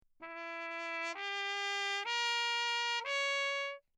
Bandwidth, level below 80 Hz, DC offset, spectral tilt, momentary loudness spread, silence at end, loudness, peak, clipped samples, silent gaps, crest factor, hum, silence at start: 15.5 kHz; -86 dBFS; under 0.1%; 2.5 dB/octave; 9 LU; 0.2 s; -35 LUFS; -22 dBFS; under 0.1%; none; 14 dB; none; 0.2 s